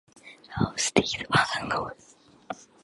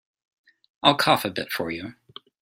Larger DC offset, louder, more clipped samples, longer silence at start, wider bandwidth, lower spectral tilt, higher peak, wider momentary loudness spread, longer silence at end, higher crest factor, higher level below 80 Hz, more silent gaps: neither; second, -26 LUFS vs -22 LUFS; neither; second, 0.25 s vs 0.85 s; second, 11.5 kHz vs 16.5 kHz; about the same, -3.5 dB/octave vs -4 dB/octave; about the same, -4 dBFS vs -2 dBFS; first, 17 LU vs 14 LU; second, 0.2 s vs 0.5 s; about the same, 26 dB vs 24 dB; first, -52 dBFS vs -64 dBFS; neither